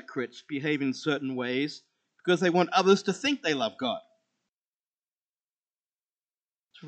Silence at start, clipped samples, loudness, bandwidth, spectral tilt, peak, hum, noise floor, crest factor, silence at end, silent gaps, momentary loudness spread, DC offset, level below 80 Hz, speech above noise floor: 0.1 s; under 0.1%; -28 LUFS; 8.8 kHz; -5 dB/octave; -8 dBFS; none; under -90 dBFS; 22 dB; 0 s; 4.53-4.98 s, 5.15-5.36 s, 5.43-5.62 s, 5.71-5.97 s, 6.05-6.17 s, 6.24-6.28 s, 6.34-6.41 s, 6.48-6.64 s; 12 LU; under 0.1%; -84 dBFS; over 63 dB